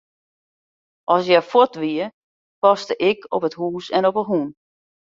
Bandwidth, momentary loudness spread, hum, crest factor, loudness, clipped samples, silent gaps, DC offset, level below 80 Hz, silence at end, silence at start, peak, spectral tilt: 7.6 kHz; 11 LU; none; 20 dB; -19 LUFS; under 0.1%; 2.14-2.62 s; under 0.1%; -68 dBFS; 0.6 s; 1.1 s; -2 dBFS; -6 dB/octave